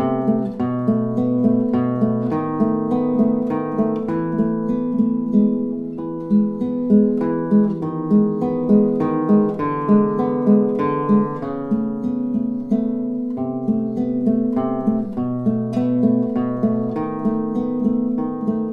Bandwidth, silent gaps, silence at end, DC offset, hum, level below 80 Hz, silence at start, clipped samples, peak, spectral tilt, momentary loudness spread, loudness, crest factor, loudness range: 4 kHz; none; 0 s; under 0.1%; none; -54 dBFS; 0 s; under 0.1%; -4 dBFS; -11 dB/octave; 6 LU; -20 LUFS; 16 dB; 4 LU